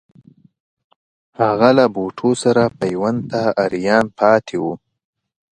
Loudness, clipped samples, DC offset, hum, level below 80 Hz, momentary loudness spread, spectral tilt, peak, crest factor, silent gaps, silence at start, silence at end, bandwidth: -17 LUFS; under 0.1%; under 0.1%; none; -56 dBFS; 9 LU; -6 dB/octave; 0 dBFS; 18 dB; none; 1.4 s; 0.8 s; 11 kHz